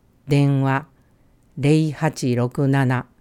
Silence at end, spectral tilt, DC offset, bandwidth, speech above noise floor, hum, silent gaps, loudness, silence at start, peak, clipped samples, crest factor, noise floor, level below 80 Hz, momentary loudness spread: 0.2 s; -7.5 dB/octave; under 0.1%; 12 kHz; 37 dB; none; none; -20 LUFS; 0.25 s; -4 dBFS; under 0.1%; 16 dB; -56 dBFS; -54 dBFS; 5 LU